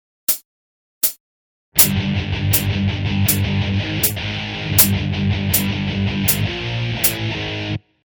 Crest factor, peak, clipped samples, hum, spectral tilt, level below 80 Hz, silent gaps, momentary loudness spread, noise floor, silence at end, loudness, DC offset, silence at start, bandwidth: 20 dB; 0 dBFS; under 0.1%; none; -3.5 dB/octave; -38 dBFS; 0.45-1.01 s, 1.20-1.72 s; 10 LU; under -90 dBFS; 0.3 s; -18 LUFS; under 0.1%; 0.3 s; over 20 kHz